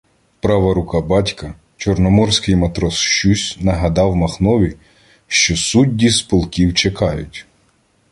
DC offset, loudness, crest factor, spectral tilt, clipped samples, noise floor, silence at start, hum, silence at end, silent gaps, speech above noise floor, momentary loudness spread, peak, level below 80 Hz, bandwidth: under 0.1%; -15 LUFS; 16 dB; -4.5 dB/octave; under 0.1%; -58 dBFS; 0.45 s; none; 0.7 s; none; 43 dB; 9 LU; 0 dBFS; -30 dBFS; 11.5 kHz